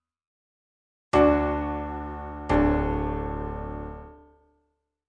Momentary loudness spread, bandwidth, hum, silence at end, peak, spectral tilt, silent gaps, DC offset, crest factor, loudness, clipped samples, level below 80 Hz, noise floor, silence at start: 16 LU; 9.2 kHz; none; 0.95 s; -8 dBFS; -8 dB/octave; none; under 0.1%; 20 dB; -26 LUFS; under 0.1%; -36 dBFS; -75 dBFS; 1.15 s